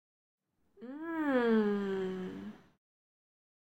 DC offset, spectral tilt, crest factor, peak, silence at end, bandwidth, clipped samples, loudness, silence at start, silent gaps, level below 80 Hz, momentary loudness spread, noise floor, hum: under 0.1%; -8 dB/octave; 18 dB; -18 dBFS; 1.2 s; 15.5 kHz; under 0.1%; -33 LUFS; 0.8 s; none; -74 dBFS; 20 LU; -55 dBFS; none